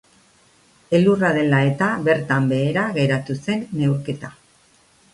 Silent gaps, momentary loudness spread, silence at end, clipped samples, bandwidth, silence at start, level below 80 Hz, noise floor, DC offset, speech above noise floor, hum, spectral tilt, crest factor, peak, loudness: none; 8 LU; 0.85 s; under 0.1%; 11.5 kHz; 0.9 s; -56 dBFS; -56 dBFS; under 0.1%; 37 dB; none; -7.5 dB/octave; 16 dB; -4 dBFS; -20 LUFS